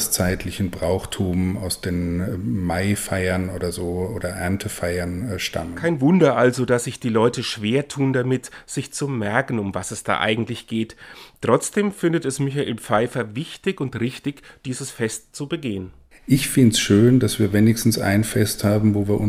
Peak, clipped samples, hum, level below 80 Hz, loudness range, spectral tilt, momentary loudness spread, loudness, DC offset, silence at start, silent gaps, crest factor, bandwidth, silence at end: -2 dBFS; under 0.1%; none; -46 dBFS; 6 LU; -5.5 dB/octave; 12 LU; -21 LUFS; under 0.1%; 0 s; none; 18 dB; 16.5 kHz; 0 s